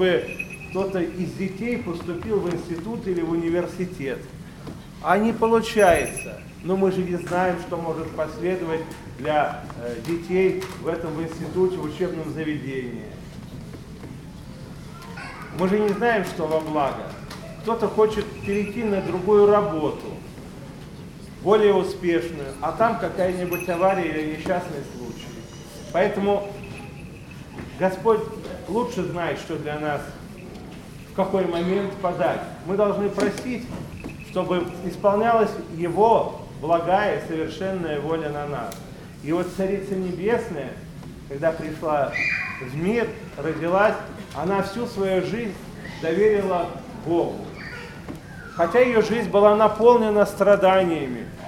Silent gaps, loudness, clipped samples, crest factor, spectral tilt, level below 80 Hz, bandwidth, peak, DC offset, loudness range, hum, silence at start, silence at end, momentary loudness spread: none; -23 LUFS; under 0.1%; 22 dB; -6 dB/octave; -48 dBFS; 16.5 kHz; -2 dBFS; under 0.1%; 6 LU; none; 0 s; 0 s; 20 LU